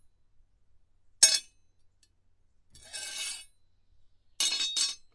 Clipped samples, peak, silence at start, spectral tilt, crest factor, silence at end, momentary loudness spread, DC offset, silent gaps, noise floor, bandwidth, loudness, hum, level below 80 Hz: under 0.1%; -4 dBFS; 1.2 s; 3.5 dB/octave; 30 dB; 0.2 s; 18 LU; under 0.1%; none; -66 dBFS; 11.5 kHz; -26 LUFS; none; -68 dBFS